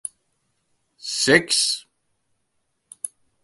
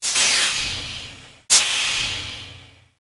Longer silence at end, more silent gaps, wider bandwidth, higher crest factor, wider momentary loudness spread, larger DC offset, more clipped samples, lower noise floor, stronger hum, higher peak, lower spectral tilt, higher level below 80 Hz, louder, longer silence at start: about the same, 0.35 s vs 0.4 s; neither; about the same, 12 kHz vs 12 kHz; about the same, 26 dB vs 22 dB; about the same, 19 LU vs 19 LU; neither; neither; first, -73 dBFS vs -45 dBFS; neither; about the same, 0 dBFS vs 0 dBFS; first, -2 dB/octave vs 1 dB/octave; second, -64 dBFS vs -50 dBFS; about the same, -19 LUFS vs -18 LUFS; first, 1.05 s vs 0 s